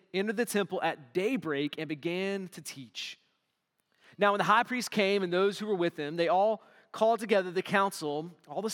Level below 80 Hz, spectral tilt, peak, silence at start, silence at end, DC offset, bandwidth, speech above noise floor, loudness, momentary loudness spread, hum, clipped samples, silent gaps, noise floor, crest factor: -88 dBFS; -4.5 dB/octave; -10 dBFS; 0.15 s; 0 s; under 0.1%; 18 kHz; 50 dB; -30 LUFS; 13 LU; none; under 0.1%; none; -79 dBFS; 20 dB